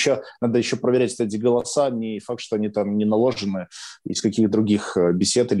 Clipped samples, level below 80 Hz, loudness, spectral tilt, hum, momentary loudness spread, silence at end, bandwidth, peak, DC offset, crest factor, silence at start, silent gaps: under 0.1%; -62 dBFS; -22 LUFS; -5 dB/octave; none; 9 LU; 0 s; 11.5 kHz; -8 dBFS; under 0.1%; 12 dB; 0 s; none